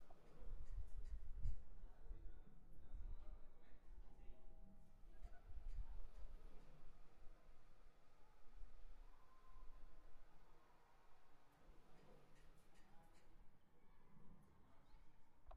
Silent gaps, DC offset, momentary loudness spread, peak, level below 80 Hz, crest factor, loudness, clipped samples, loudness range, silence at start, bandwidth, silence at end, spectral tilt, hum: none; under 0.1%; 14 LU; -32 dBFS; -58 dBFS; 18 dB; -62 LUFS; under 0.1%; 6 LU; 0 s; 4.9 kHz; 0 s; -6.5 dB/octave; none